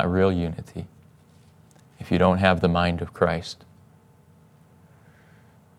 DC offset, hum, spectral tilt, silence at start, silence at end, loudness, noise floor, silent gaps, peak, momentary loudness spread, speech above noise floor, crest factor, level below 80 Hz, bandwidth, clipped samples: under 0.1%; none; -7 dB/octave; 0 s; 2.25 s; -23 LUFS; -55 dBFS; none; -2 dBFS; 21 LU; 32 dB; 24 dB; -52 dBFS; 11 kHz; under 0.1%